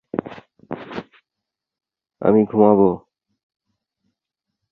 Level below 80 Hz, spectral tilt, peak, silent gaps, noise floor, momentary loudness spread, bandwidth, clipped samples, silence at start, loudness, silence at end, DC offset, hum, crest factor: -58 dBFS; -10.5 dB/octave; -2 dBFS; none; -84 dBFS; 20 LU; 4.8 kHz; under 0.1%; 0.15 s; -17 LUFS; 1.75 s; under 0.1%; none; 20 dB